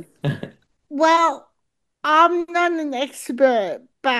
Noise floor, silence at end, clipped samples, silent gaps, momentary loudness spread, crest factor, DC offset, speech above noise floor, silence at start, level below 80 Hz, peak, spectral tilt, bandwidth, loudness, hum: -77 dBFS; 0 s; under 0.1%; none; 16 LU; 18 dB; under 0.1%; 57 dB; 0 s; -66 dBFS; -2 dBFS; -5 dB/octave; 12.5 kHz; -19 LUFS; none